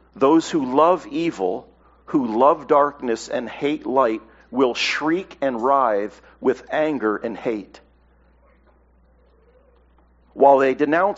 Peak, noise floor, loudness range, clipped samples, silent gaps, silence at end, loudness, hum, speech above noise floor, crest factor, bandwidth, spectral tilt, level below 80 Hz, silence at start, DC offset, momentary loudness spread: 0 dBFS; -56 dBFS; 8 LU; under 0.1%; none; 0 s; -20 LUFS; none; 36 dB; 20 dB; 8 kHz; -3 dB/octave; -58 dBFS; 0.15 s; under 0.1%; 10 LU